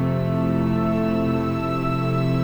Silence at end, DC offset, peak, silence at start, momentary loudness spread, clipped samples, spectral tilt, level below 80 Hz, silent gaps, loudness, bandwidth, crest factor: 0 s; under 0.1%; -10 dBFS; 0 s; 2 LU; under 0.1%; -9 dB/octave; -40 dBFS; none; -22 LUFS; over 20 kHz; 12 dB